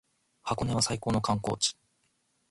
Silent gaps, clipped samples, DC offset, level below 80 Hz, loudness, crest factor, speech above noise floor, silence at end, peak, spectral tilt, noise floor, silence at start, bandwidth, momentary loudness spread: none; under 0.1%; under 0.1%; -54 dBFS; -29 LUFS; 20 dB; 44 dB; 0.8 s; -12 dBFS; -4 dB/octave; -73 dBFS; 0.45 s; 11.5 kHz; 6 LU